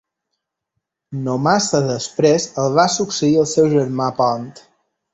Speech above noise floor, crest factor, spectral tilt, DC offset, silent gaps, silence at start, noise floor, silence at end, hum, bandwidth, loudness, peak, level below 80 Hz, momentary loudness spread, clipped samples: 61 dB; 16 dB; -5 dB/octave; under 0.1%; none; 1.1 s; -78 dBFS; 0.55 s; none; 8.4 kHz; -17 LUFS; -2 dBFS; -56 dBFS; 9 LU; under 0.1%